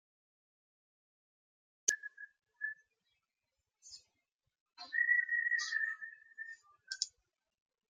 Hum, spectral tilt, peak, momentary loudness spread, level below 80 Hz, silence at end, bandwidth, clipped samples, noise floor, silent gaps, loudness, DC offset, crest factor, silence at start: none; 4 dB/octave; -12 dBFS; 24 LU; under -90 dBFS; 0.85 s; 14.5 kHz; under 0.1%; -89 dBFS; 4.34-4.39 s, 4.60-4.66 s; -35 LUFS; under 0.1%; 30 dB; 1.85 s